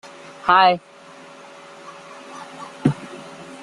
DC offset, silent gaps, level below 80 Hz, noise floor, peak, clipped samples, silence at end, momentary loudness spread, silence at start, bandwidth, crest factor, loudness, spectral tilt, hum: under 0.1%; none; -60 dBFS; -43 dBFS; -2 dBFS; under 0.1%; 0 s; 27 LU; 0.45 s; 11.5 kHz; 22 dB; -19 LUFS; -5.5 dB/octave; none